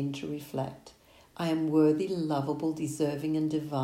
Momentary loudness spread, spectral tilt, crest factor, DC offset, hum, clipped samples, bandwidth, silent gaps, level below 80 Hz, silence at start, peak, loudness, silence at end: 11 LU; -7 dB/octave; 16 dB; under 0.1%; none; under 0.1%; 16 kHz; none; -66 dBFS; 0 s; -14 dBFS; -30 LUFS; 0 s